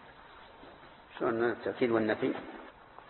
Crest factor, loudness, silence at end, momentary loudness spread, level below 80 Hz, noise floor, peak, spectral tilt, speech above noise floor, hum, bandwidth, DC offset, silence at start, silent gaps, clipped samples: 20 dB; -32 LUFS; 0 s; 23 LU; -68 dBFS; -54 dBFS; -16 dBFS; -9.5 dB/octave; 22 dB; none; 4.3 kHz; under 0.1%; 0 s; none; under 0.1%